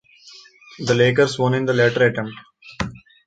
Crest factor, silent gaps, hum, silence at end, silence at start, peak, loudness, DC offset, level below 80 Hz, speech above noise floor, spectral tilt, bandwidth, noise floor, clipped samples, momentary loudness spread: 18 dB; none; none; 0.3 s; 0.25 s; -4 dBFS; -19 LUFS; under 0.1%; -50 dBFS; 28 dB; -5.5 dB/octave; 9.2 kHz; -46 dBFS; under 0.1%; 13 LU